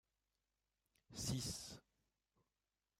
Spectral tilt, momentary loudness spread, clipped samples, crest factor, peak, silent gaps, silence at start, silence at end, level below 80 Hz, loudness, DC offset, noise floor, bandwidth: -3.5 dB/octave; 14 LU; under 0.1%; 22 dB; -30 dBFS; none; 1.1 s; 1.2 s; -68 dBFS; -46 LUFS; under 0.1%; under -90 dBFS; 16 kHz